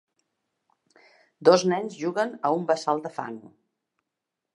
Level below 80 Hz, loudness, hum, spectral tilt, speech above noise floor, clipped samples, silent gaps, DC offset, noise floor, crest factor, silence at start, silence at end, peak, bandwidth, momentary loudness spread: -80 dBFS; -25 LUFS; none; -5 dB/octave; 61 dB; under 0.1%; none; under 0.1%; -85 dBFS; 24 dB; 1.4 s; 1.15 s; -4 dBFS; 11.5 kHz; 16 LU